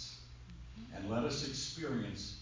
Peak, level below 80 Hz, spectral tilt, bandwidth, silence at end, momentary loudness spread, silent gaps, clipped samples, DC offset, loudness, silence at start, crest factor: -24 dBFS; -56 dBFS; -4.5 dB/octave; 7.6 kHz; 0 s; 16 LU; none; under 0.1%; under 0.1%; -39 LUFS; 0 s; 18 dB